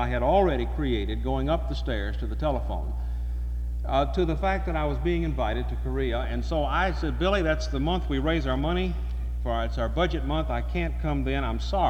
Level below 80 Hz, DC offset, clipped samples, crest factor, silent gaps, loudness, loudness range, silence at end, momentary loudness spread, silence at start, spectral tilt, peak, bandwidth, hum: -30 dBFS; under 0.1%; under 0.1%; 16 dB; none; -27 LUFS; 2 LU; 0 s; 7 LU; 0 s; -7 dB/octave; -10 dBFS; 6.8 kHz; 60 Hz at -30 dBFS